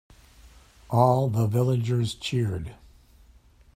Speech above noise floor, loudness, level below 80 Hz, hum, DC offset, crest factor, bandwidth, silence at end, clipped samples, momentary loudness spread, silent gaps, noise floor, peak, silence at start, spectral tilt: 32 dB; -25 LUFS; -52 dBFS; none; under 0.1%; 22 dB; 15 kHz; 1 s; under 0.1%; 9 LU; none; -55 dBFS; -6 dBFS; 0.45 s; -7 dB/octave